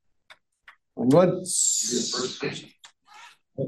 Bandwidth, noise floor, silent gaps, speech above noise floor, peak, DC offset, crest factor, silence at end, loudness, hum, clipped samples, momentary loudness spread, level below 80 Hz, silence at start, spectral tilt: 12.5 kHz; -57 dBFS; none; 34 dB; -4 dBFS; under 0.1%; 22 dB; 0 s; -23 LUFS; none; under 0.1%; 20 LU; -72 dBFS; 0.3 s; -3.5 dB/octave